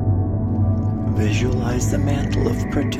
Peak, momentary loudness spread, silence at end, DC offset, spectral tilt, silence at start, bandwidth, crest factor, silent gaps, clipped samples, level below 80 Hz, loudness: -6 dBFS; 2 LU; 0 s; under 0.1%; -7 dB/octave; 0 s; 13.5 kHz; 14 dB; none; under 0.1%; -30 dBFS; -20 LUFS